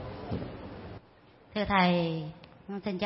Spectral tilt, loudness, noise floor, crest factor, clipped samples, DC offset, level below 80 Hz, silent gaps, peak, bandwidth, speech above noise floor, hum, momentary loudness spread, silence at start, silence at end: -10 dB/octave; -31 LUFS; -58 dBFS; 20 dB; under 0.1%; under 0.1%; -54 dBFS; none; -12 dBFS; 5.8 kHz; 29 dB; none; 22 LU; 0 s; 0 s